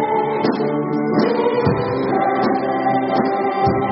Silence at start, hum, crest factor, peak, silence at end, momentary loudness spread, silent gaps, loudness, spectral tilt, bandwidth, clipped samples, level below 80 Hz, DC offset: 0 s; none; 14 dB; -4 dBFS; 0 s; 2 LU; none; -18 LUFS; -5.5 dB/octave; 5.8 kHz; under 0.1%; -48 dBFS; under 0.1%